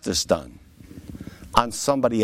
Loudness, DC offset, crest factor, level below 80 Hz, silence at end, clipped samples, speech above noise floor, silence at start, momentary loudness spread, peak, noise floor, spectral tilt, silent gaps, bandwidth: -23 LUFS; under 0.1%; 22 dB; -44 dBFS; 0 s; under 0.1%; 21 dB; 0.05 s; 21 LU; -2 dBFS; -42 dBFS; -4 dB/octave; none; 16.5 kHz